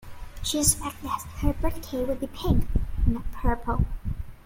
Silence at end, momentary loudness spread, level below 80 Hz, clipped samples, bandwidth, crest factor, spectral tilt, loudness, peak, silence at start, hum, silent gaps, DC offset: 0.05 s; 10 LU; -30 dBFS; under 0.1%; 17 kHz; 20 dB; -4.5 dB/octave; -28 LUFS; -6 dBFS; 0 s; none; none; under 0.1%